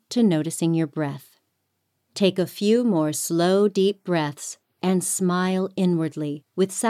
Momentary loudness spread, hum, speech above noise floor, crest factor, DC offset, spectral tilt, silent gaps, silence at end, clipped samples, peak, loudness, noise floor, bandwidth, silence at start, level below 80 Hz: 10 LU; none; 52 dB; 16 dB; under 0.1%; -5.5 dB/octave; none; 0 s; under 0.1%; -6 dBFS; -23 LUFS; -74 dBFS; 15.5 kHz; 0.1 s; -72 dBFS